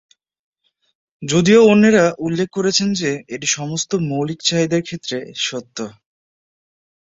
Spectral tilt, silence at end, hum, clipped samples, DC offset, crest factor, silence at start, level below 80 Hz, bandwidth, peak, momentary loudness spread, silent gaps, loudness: -4.5 dB/octave; 1.1 s; none; under 0.1%; under 0.1%; 16 dB; 1.2 s; -56 dBFS; 8 kHz; -2 dBFS; 15 LU; none; -17 LUFS